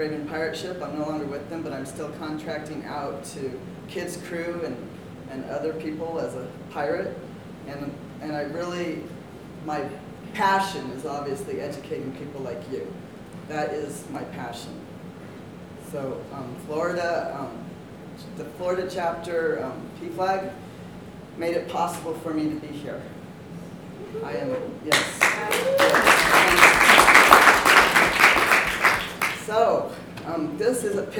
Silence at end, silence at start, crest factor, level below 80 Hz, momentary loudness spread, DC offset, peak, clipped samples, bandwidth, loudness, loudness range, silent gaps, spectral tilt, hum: 0 s; 0 s; 24 dB; -52 dBFS; 24 LU; under 0.1%; 0 dBFS; under 0.1%; over 20 kHz; -22 LUFS; 18 LU; none; -3 dB/octave; none